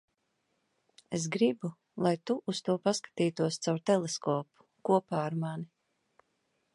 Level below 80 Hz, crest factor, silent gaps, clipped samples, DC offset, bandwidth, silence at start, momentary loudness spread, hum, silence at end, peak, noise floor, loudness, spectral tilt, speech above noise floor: -78 dBFS; 20 dB; none; under 0.1%; under 0.1%; 11.5 kHz; 1.1 s; 10 LU; none; 1.1 s; -12 dBFS; -78 dBFS; -32 LUFS; -5.5 dB/octave; 48 dB